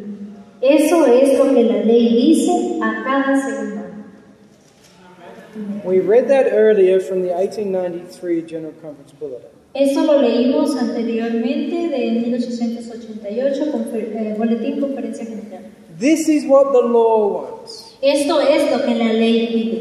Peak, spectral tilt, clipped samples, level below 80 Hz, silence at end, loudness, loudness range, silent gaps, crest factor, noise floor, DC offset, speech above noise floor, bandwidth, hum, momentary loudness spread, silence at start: -2 dBFS; -5 dB/octave; under 0.1%; -68 dBFS; 0 s; -16 LUFS; 7 LU; none; 16 dB; -48 dBFS; under 0.1%; 32 dB; 13.5 kHz; none; 19 LU; 0 s